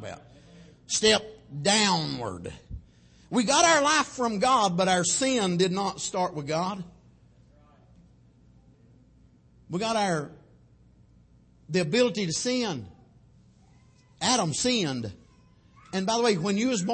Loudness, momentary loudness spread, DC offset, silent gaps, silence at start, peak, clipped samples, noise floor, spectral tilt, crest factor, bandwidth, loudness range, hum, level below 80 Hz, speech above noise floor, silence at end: -25 LUFS; 18 LU; under 0.1%; none; 0 s; -8 dBFS; under 0.1%; -58 dBFS; -3 dB/octave; 20 dB; 8.8 kHz; 11 LU; none; -58 dBFS; 33 dB; 0 s